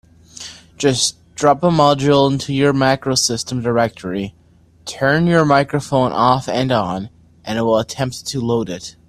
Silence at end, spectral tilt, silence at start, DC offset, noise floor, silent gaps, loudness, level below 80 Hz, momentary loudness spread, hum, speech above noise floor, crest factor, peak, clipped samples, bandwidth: 0.2 s; -4.5 dB/octave; 0.4 s; under 0.1%; -40 dBFS; none; -17 LUFS; -48 dBFS; 16 LU; none; 24 dB; 18 dB; 0 dBFS; under 0.1%; 14 kHz